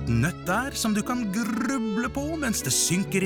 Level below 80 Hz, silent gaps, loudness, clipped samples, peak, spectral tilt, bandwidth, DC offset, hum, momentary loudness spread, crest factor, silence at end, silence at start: -44 dBFS; none; -26 LUFS; under 0.1%; -14 dBFS; -4 dB/octave; over 20 kHz; under 0.1%; none; 6 LU; 12 dB; 0 s; 0 s